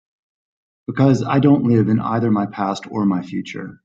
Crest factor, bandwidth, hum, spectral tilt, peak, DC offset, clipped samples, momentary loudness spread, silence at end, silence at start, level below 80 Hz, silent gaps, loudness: 16 dB; 7.8 kHz; none; -8 dB/octave; -2 dBFS; under 0.1%; under 0.1%; 13 LU; 0.1 s; 0.9 s; -56 dBFS; none; -18 LUFS